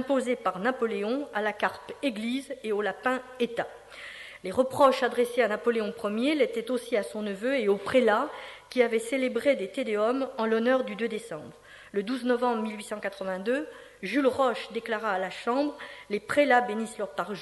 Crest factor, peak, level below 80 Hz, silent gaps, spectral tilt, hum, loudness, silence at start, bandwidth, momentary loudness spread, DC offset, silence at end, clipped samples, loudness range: 20 dB; -8 dBFS; -68 dBFS; none; -4.5 dB/octave; none; -28 LUFS; 0 s; 12 kHz; 11 LU; under 0.1%; 0 s; under 0.1%; 4 LU